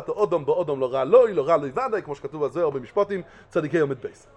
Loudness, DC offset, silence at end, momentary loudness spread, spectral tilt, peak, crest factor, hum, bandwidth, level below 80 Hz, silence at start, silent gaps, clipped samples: -23 LUFS; under 0.1%; 0.25 s; 12 LU; -7.5 dB/octave; -4 dBFS; 18 dB; none; 8.6 kHz; -60 dBFS; 0 s; none; under 0.1%